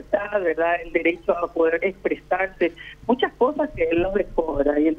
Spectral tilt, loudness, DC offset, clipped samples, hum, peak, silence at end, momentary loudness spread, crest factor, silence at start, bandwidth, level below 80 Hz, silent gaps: -7 dB/octave; -23 LUFS; under 0.1%; under 0.1%; 50 Hz at -50 dBFS; -4 dBFS; 0 s; 4 LU; 18 dB; 0 s; 6.2 kHz; -42 dBFS; none